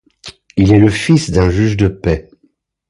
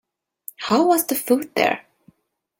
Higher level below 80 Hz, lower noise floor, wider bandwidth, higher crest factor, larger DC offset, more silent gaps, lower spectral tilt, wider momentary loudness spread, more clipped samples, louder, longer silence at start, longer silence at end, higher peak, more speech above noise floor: first, -28 dBFS vs -68 dBFS; second, -58 dBFS vs -64 dBFS; second, 11.5 kHz vs 17 kHz; second, 14 dB vs 20 dB; neither; neither; first, -7 dB/octave vs -3.5 dB/octave; second, 9 LU vs 17 LU; neither; first, -13 LUFS vs -20 LUFS; second, 0.25 s vs 0.6 s; about the same, 0.7 s vs 0.8 s; about the same, 0 dBFS vs -2 dBFS; about the same, 47 dB vs 45 dB